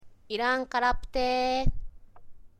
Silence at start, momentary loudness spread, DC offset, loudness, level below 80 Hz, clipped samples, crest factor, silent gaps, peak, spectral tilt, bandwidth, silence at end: 0.05 s; 9 LU; under 0.1%; -28 LUFS; -36 dBFS; under 0.1%; 18 dB; none; -10 dBFS; -5 dB/octave; 9.2 kHz; 0.15 s